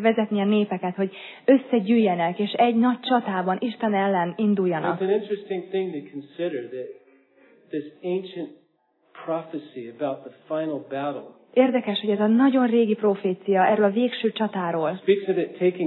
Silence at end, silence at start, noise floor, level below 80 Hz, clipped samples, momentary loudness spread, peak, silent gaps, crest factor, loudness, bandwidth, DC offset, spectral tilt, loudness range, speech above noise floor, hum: 0 s; 0 s; -66 dBFS; -88 dBFS; under 0.1%; 14 LU; -6 dBFS; none; 18 dB; -23 LUFS; 4.2 kHz; under 0.1%; -10 dB/octave; 11 LU; 43 dB; none